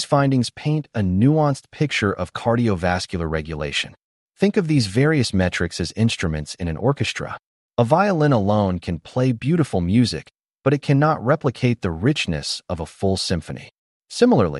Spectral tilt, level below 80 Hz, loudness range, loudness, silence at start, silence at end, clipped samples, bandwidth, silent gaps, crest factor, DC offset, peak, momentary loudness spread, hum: -6 dB/octave; -44 dBFS; 2 LU; -21 LUFS; 0 s; 0 s; under 0.1%; 11.5 kHz; 4.04-4.27 s, 7.46-7.70 s, 13.78-14.01 s; 16 dB; under 0.1%; -4 dBFS; 9 LU; none